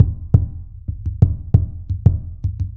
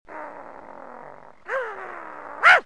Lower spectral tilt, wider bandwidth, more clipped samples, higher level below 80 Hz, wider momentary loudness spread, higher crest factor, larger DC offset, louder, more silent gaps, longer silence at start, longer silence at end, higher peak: first, -12.5 dB/octave vs -1 dB/octave; second, 1.5 kHz vs 10.5 kHz; neither; first, -26 dBFS vs -68 dBFS; second, 13 LU vs 23 LU; second, 18 dB vs 24 dB; second, under 0.1% vs 0.3%; first, -19 LUFS vs -22 LUFS; neither; about the same, 0 s vs 0.1 s; about the same, 0 s vs 0.05 s; about the same, 0 dBFS vs 0 dBFS